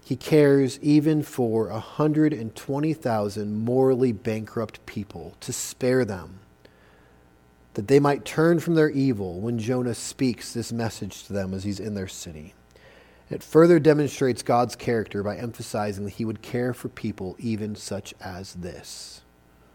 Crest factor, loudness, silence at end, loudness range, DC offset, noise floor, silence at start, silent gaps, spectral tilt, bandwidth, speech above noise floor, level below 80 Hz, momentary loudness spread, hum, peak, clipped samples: 20 dB; -24 LUFS; 0.55 s; 8 LU; under 0.1%; -56 dBFS; 0.05 s; none; -6.5 dB/octave; 18 kHz; 32 dB; -58 dBFS; 17 LU; none; -4 dBFS; under 0.1%